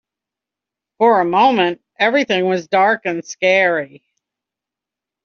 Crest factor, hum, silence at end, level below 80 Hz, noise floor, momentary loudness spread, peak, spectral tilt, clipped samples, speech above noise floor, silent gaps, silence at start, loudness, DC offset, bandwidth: 16 dB; none; 1.4 s; -66 dBFS; -86 dBFS; 7 LU; -2 dBFS; -2 dB/octave; under 0.1%; 70 dB; none; 1 s; -16 LUFS; under 0.1%; 7.2 kHz